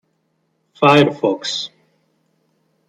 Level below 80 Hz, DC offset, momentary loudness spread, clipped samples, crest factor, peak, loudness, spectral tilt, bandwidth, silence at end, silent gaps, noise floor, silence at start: -64 dBFS; under 0.1%; 13 LU; under 0.1%; 18 dB; -2 dBFS; -16 LUFS; -5 dB/octave; 10.5 kHz; 1.2 s; none; -67 dBFS; 0.8 s